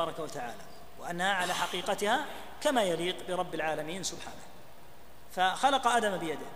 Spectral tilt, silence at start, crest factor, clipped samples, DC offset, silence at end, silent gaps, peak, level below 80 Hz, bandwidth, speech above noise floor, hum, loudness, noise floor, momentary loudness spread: -3 dB/octave; 0 s; 20 dB; under 0.1%; 0.7%; 0 s; none; -12 dBFS; -62 dBFS; 15.5 kHz; 23 dB; none; -31 LUFS; -55 dBFS; 17 LU